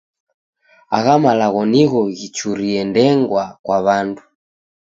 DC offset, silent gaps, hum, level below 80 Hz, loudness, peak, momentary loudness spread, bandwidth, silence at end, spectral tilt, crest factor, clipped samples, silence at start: under 0.1%; 3.59-3.64 s; none; -58 dBFS; -16 LUFS; 0 dBFS; 9 LU; 7.8 kHz; 0.7 s; -6 dB/octave; 16 dB; under 0.1%; 0.9 s